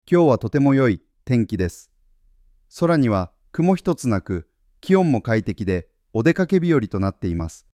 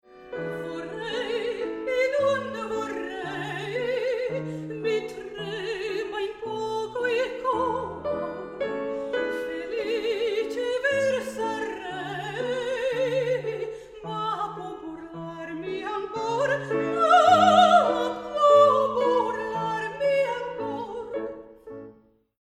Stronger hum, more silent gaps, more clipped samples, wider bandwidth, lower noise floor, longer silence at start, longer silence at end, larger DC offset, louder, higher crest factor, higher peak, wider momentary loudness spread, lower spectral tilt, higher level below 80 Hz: neither; neither; neither; about the same, 14 kHz vs 14 kHz; about the same, -57 dBFS vs -55 dBFS; about the same, 0.1 s vs 0.1 s; second, 0.2 s vs 0.5 s; neither; first, -21 LUFS vs -26 LUFS; about the same, 16 dB vs 20 dB; about the same, -4 dBFS vs -6 dBFS; second, 11 LU vs 16 LU; first, -8 dB/octave vs -4.5 dB/octave; first, -46 dBFS vs -60 dBFS